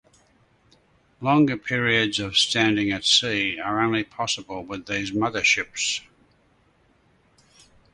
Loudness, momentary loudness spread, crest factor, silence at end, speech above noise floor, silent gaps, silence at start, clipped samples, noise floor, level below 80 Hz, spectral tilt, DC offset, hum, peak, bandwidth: -22 LUFS; 10 LU; 20 dB; 1.9 s; 39 dB; none; 1.2 s; under 0.1%; -62 dBFS; -58 dBFS; -3 dB/octave; under 0.1%; none; -4 dBFS; 11.5 kHz